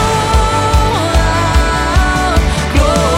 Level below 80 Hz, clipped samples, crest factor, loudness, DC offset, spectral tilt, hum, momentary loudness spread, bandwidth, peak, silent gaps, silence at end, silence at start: -16 dBFS; under 0.1%; 10 dB; -12 LUFS; under 0.1%; -5 dB/octave; none; 1 LU; 15.5 kHz; 0 dBFS; none; 0 s; 0 s